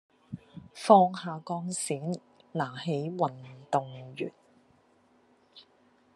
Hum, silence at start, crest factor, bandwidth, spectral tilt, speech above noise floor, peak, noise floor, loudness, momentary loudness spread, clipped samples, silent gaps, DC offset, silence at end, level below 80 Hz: none; 0.3 s; 26 dB; 12 kHz; -5.5 dB/octave; 36 dB; -6 dBFS; -65 dBFS; -29 LUFS; 24 LU; under 0.1%; none; under 0.1%; 0.55 s; -80 dBFS